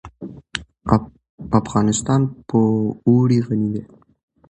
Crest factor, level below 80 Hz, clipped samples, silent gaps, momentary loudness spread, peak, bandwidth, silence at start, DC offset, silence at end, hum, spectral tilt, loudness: 20 dB; -44 dBFS; under 0.1%; 1.29-1.38 s; 14 LU; 0 dBFS; 10 kHz; 0.05 s; under 0.1%; 0.65 s; none; -6.5 dB/octave; -19 LUFS